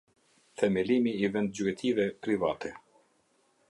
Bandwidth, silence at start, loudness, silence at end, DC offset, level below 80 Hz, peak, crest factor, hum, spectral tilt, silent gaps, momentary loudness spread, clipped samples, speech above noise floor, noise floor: 11.5 kHz; 0.6 s; -30 LUFS; 0.9 s; under 0.1%; -66 dBFS; -12 dBFS; 18 dB; none; -6 dB/octave; none; 9 LU; under 0.1%; 41 dB; -70 dBFS